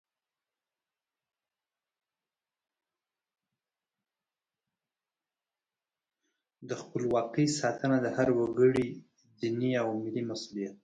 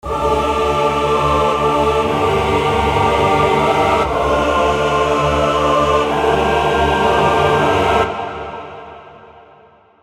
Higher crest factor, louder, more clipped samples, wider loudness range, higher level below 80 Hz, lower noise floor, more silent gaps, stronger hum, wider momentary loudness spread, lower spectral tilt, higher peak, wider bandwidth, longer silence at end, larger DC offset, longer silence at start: first, 22 dB vs 14 dB; second, -30 LUFS vs -15 LUFS; neither; first, 10 LU vs 2 LU; second, -70 dBFS vs -30 dBFS; first, under -90 dBFS vs -47 dBFS; neither; neither; first, 12 LU vs 3 LU; about the same, -6 dB/octave vs -5.5 dB/octave; second, -12 dBFS vs 0 dBFS; second, 9.6 kHz vs 15.5 kHz; second, 0.1 s vs 0.75 s; neither; first, 6.6 s vs 0.05 s